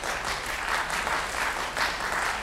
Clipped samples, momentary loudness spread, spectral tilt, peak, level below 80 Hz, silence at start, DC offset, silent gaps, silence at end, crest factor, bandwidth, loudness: under 0.1%; 3 LU; -1.5 dB/octave; -12 dBFS; -46 dBFS; 0 s; under 0.1%; none; 0 s; 16 dB; 16 kHz; -28 LUFS